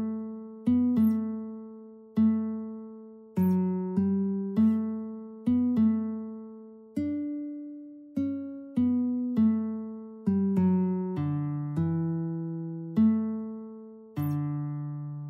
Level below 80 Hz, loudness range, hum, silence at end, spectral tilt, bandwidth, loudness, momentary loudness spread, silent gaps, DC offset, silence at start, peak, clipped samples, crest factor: -66 dBFS; 3 LU; none; 0 s; -11 dB/octave; 15.5 kHz; -29 LUFS; 16 LU; none; under 0.1%; 0 s; -14 dBFS; under 0.1%; 14 dB